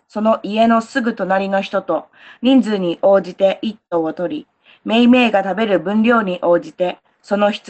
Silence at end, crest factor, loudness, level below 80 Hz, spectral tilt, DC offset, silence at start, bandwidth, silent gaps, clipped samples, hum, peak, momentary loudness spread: 0.1 s; 14 dB; -16 LUFS; -62 dBFS; -6.5 dB/octave; under 0.1%; 0.15 s; 8.6 kHz; none; under 0.1%; none; -2 dBFS; 10 LU